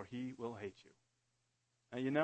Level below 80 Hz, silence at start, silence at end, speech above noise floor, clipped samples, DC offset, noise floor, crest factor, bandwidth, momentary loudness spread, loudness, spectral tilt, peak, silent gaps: -84 dBFS; 0 s; 0 s; 42 dB; under 0.1%; under 0.1%; -83 dBFS; 22 dB; 8.4 kHz; 10 LU; -45 LUFS; -7 dB/octave; -20 dBFS; none